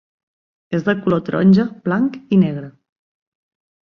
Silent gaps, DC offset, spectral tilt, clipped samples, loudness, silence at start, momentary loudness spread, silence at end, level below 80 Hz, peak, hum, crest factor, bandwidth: none; under 0.1%; -9 dB/octave; under 0.1%; -17 LUFS; 0.7 s; 8 LU; 1.15 s; -56 dBFS; -2 dBFS; none; 16 dB; 6 kHz